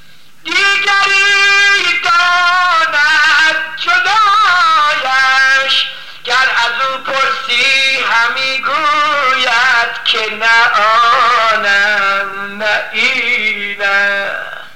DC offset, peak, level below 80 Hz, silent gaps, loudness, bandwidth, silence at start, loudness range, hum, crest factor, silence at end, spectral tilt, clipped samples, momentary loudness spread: 2%; 0 dBFS; -60 dBFS; none; -10 LUFS; 16.5 kHz; 0.45 s; 3 LU; none; 12 dB; 0.05 s; 0 dB/octave; under 0.1%; 7 LU